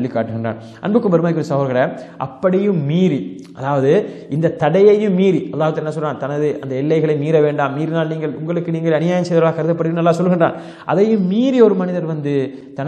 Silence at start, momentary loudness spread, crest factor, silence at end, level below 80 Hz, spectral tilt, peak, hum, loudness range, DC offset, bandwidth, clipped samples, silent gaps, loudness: 0 s; 9 LU; 16 dB; 0 s; -64 dBFS; -8 dB/octave; 0 dBFS; none; 2 LU; under 0.1%; 9 kHz; under 0.1%; none; -17 LUFS